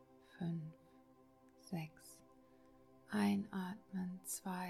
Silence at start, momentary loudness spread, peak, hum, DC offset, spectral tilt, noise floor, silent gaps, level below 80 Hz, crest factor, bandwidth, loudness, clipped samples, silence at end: 0 s; 25 LU; -24 dBFS; none; under 0.1%; -5.5 dB/octave; -67 dBFS; none; -80 dBFS; 20 dB; 15.5 kHz; -43 LUFS; under 0.1%; 0 s